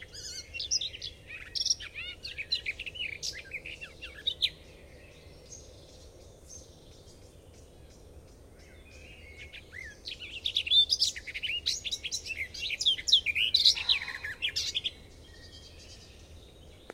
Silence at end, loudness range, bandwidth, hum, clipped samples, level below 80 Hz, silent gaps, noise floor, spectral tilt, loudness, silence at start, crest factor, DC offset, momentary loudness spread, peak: 0 s; 12 LU; 16 kHz; none; under 0.1%; -56 dBFS; none; -53 dBFS; 0.5 dB/octave; -29 LUFS; 0 s; 26 dB; under 0.1%; 26 LU; -10 dBFS